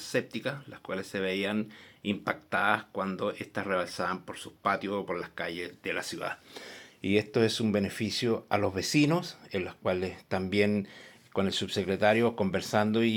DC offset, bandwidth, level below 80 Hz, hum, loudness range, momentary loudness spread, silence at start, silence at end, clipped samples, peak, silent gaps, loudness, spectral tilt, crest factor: under 0.1%; 17 kHz; -72 dBFS; none; 4 LU; 12 LU; 0 s; 0 s; under 0.1%; -8 dBFS; none; -30 LUFS; -5 dB/octave; 22 dB